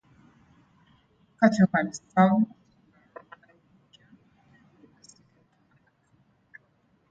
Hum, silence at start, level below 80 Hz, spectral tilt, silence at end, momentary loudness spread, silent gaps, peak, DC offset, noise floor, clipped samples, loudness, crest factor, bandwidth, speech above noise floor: none; 1.4 s; -68 dBFS; -7 dB/octave; 4.65 s; 19 LU; none; -6 dBFS; under 0.1%; -67 dBFS; under 0.1%; -23 LUFS; 24 dB; 8 kHz; 45 dB